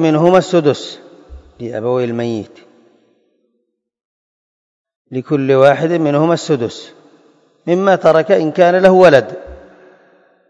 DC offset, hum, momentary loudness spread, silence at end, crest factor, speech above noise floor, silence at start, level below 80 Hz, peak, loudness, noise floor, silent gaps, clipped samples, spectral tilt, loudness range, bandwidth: under 0.1%; none; 18 LU; 0.95 s; 14 dB; 57 dB; 0 s; -50 dBFS; 0 dBFS; -12 LUFS; -69 dBFS; 4.05-4.85 s, 4.96-5.05 s; 0.3%; -6.5 dB/octave; 12 LU; 8.6 kHz